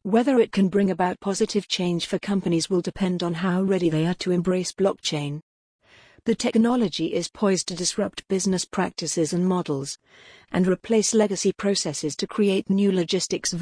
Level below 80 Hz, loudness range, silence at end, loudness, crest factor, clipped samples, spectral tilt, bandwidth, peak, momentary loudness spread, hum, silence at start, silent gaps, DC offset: -56 dBFS; 2 LU; 0 s; -24 LUFS; 16 dB; under 0.1%; -5 dB/octave; 10.5 kHz; -8 dBFS; 7 LU; none; 0.05 s; 5.42-5.79 s; under 0.1%